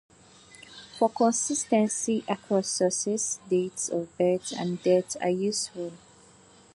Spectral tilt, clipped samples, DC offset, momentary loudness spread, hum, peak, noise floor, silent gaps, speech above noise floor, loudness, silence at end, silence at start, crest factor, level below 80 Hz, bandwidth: -4 dB/octave; under 0.1%; under 0.1%; 9 LU; none; -10 dBFS; -55 dBFS; none; 29 dB; -27 LUFS; 0.8 s; 0.6 s; 18 dB; -70 dBFS; 11.5 kHz